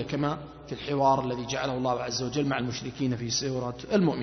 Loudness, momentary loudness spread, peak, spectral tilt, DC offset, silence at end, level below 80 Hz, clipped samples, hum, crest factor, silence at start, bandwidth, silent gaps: -29 LUFS; 9 LU; -10 dBFS; -5 dB/octave; under 0.1%; 0 s; -54 dBFS; under 0.1%; none; 18 dB; 0 s; 6.4 kHz; none